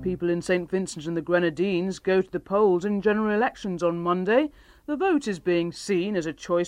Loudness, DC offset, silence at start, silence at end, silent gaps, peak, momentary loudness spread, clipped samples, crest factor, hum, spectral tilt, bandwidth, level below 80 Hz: -25 LUFS; under 0.1%; 0 s; 0 s; none; -8 dBFS; 7 LU; under 0.1%; 16 dB; none; -6 dB/octave; 11.5 kHz; -56 dBFS